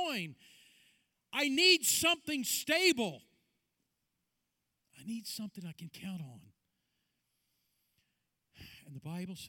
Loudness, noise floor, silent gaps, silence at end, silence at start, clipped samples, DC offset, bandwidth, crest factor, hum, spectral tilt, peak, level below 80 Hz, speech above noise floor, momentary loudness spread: -30 LUFS; -85 dBFS; none; 0 s; 0 s; under 0.1%; under 0.1%; 19 kHz; 22 dB; none; -2 dB/octave; -14 dBFS; -76 dBFS; 51 dB; 22 LU